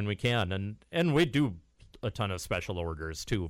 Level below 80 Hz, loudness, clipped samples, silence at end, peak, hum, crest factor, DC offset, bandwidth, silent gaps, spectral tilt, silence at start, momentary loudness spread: -50 dBFS; -31 LUFS; under 0.1%; 0 s; -12 dBFS; none; 18 dB; under 0.1%; 16 kHz; none; -5.5 dB/octave; 0 s; 12 LU